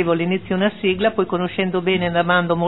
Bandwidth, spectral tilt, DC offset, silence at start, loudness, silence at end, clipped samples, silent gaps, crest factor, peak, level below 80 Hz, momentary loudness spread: 4.1 kHz; -10 dB/octave; 0.5%; 0 s; -19 LUFS; 0 s; under 0.1%; none; 16 dB; -4 dBFS; -50 dBFS; 4 LU